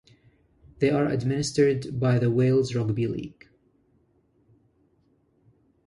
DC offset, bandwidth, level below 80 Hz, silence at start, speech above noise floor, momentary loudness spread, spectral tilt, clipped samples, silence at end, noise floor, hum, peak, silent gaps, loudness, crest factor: under 0.1%; 11.5 kHz; -56 dBFS; 0.8 s; 42 dB; 7 LU; -7 dB/octave; under 0.1%; 2.55 s; -66 dBFS; none; -10 dBFS; none; -25 LUFS; 16 dB